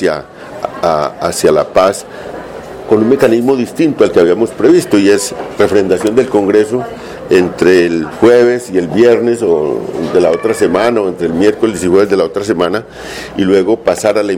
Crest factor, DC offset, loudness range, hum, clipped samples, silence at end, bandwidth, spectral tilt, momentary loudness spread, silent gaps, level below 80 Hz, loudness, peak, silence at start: 10 dB; under 0.1%; 2 LU; none; 0.2%; 0 s; 16 kHz; -5.5 dB/octave; 13 LU; none; -44 dBFS; -11 LUFS; 0 dBFS; 0 s